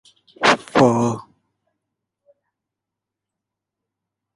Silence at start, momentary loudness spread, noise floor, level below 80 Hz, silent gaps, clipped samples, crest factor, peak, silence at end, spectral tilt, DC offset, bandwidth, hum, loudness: 0.4 s; 8 LU; -84 dBFS; -58 dBFS; none; under 0.1%; 22 dB; -2 dBFS; 3.15 s; -5 dB/octave; under 0.1%; 11.5 kHz; none; -17 LUFS